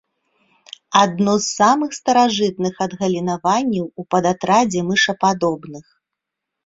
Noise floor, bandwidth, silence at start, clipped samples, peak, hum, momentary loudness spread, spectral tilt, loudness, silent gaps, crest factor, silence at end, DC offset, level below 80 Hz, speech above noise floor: -82 dBFS; 7.8 kHz; 0.9 s; under 0.1%; 0 dBFS; none; 7 LU; -4 dB/octave; -18 LUFS; none; 18 dB; 0.85 s; under 0.1%; -60 dBFS; 64 dB